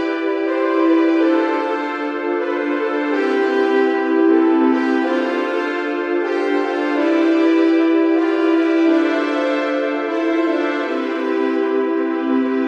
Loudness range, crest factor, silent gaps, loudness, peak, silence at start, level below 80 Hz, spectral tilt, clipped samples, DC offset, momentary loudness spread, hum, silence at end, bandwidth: 2 LU; 12 dB; none; -17 LUFS; -4 dBFS; 0 s; -70 dBFS; -4.5 dB/octave; under 0.1%; under 0.1%; 6 LU; none; 0 s; 7 kHz